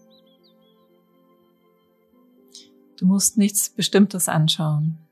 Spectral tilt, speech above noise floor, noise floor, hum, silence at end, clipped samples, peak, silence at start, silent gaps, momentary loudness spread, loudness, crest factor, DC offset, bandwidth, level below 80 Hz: -4.5 dB/octave; 41 dB; -61 dBFS; none; 0.15 s; under 0.1%; -6 dBFS; 2.55 s; none; 5 LU; -19 LUFS; 18 dB; under 0.1%; 14.5 kHz; -70 dBFS